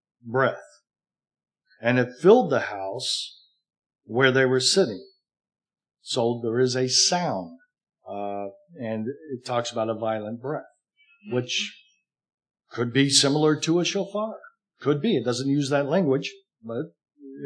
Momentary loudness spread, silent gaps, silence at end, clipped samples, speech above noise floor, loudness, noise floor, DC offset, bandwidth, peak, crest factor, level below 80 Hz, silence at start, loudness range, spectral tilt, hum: 16 LU; 3.78-3.90 s, 12.34-12.38 s; 0 s; under 0.1%; 39 dB; -24 LUFS; -63 dBFS; under 0.1%; 10.5 kHz; -4 dBFS; 22 dB; -84 dBFS; 0.25 s; 8 LU; -4 dB/octave; none